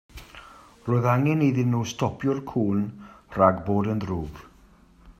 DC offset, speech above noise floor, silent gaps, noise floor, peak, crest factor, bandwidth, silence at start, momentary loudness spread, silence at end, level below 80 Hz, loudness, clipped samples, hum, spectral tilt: under 0.1%; 31 dB; none; -54 dBFS; -4 dBFS; 22 dB; 14.5 kHz; 0.15 s; 22 LU; 0.1 s; -52 dBFS; -24 LUFS; under 0.1%; none; -7.5 dB/octave